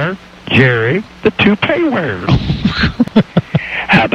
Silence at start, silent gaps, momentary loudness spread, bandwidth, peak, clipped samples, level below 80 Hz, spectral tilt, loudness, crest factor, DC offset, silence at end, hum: 0 s; none; 6 LU; 8.8 kHz; 0 dBFS; under 0.1%; -30 dBFS; -7.5 dB/octave; -13 LUFS; 14 dB; under 0.1%; 0 s; none